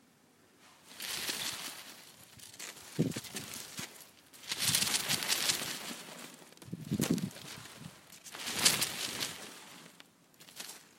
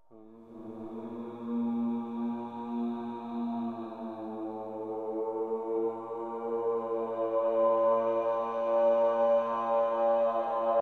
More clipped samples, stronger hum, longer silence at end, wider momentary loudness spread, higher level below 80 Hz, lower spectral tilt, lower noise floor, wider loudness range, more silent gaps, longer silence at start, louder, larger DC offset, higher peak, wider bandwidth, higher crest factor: neither; neither; about the same, 0.05 s vs 0 s; first, 23 LU vs 14 LU; first, -70 dBFS vs -76 dBFS; second, -2 dB/octave vs -8 dB/octave; first, -65 dBFS vs -53 dBFS; about the same, 7 LU vs 9 LU; neither; first, 0.6 s vs 0.1 s; second, -34 LUFS vs -31 LUFS; neither; first, -6 dBFS vs -16 dBFS; first, 16.5 kHz vs 4.3 kHz; first, 34 dB vs 14 dB